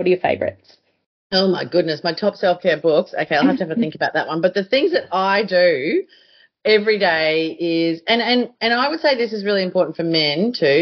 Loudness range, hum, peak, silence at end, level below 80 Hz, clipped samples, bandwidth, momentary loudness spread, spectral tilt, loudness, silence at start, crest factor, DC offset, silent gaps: 1 LU; none; -4 dBFS; 0 s; -64 dBFS; under 0.1%; 6.4 kHz; 5 LU; -2.5 dB/octave; -18 LUFS; 0 s; 16 dB; under 0.1%; 1.06-1.30 s